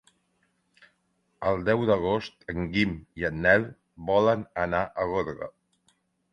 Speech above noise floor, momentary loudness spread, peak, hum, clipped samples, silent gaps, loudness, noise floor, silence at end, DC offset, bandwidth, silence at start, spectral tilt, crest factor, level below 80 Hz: 46 dB; 13 LU; -8 dBFS; none; under 0.1%; none; -26 LUFS; -72 dBFS; 0.85 s; under 0.1%; 10 kHz; 1.4 s; -7 dB/octave; 20 dB; -50 dBFS